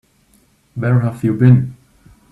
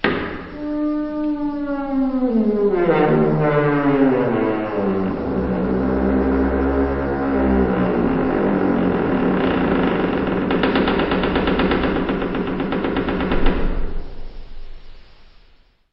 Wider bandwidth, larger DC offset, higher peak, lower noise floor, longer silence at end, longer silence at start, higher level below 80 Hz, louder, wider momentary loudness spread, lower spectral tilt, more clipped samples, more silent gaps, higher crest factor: second, 3.9 kHz vs 5.8 kHz; neither; about the same, 0 dBFS vs -2 dBFS; about the same, -55 dBFS vs -52 dBFS; about the same, 0.6 s vs 0.7 s; first, 0.75 s vs 0.05 s; second, -50 dBFS vs -30 dBFS; first, -15 LUFS vs -19 LUFS; first, 15 LU vs 6 LU; about the same, -10 dB/octave vs -10 dB/octave; neither; neither; about the same, 16 dB vs 16 dB